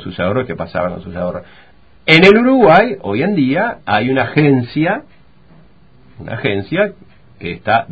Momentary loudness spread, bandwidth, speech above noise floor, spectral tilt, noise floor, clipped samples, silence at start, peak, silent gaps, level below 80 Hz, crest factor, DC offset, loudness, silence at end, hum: 15 LU; 8 kHz; 34 dB; -7.5 dB/octave; -47 dBFS; 0.1%; 0 s; 0 dBFS; none; -44 dBFS; 14 dB; 0.5%; -14 LUFS; 0 s; none